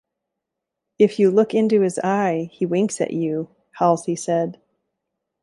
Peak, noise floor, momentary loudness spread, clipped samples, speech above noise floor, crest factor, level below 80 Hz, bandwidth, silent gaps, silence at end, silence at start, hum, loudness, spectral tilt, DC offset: -4 dBFS; -82 dBFS; 8 LU; under 0.1%; 63 dB; 18 dB; -68 dBFS; 11.5 kHz; none; 0.9 s; 1 s; none; -20 LUFS; -6 dB/octave; under 0.1%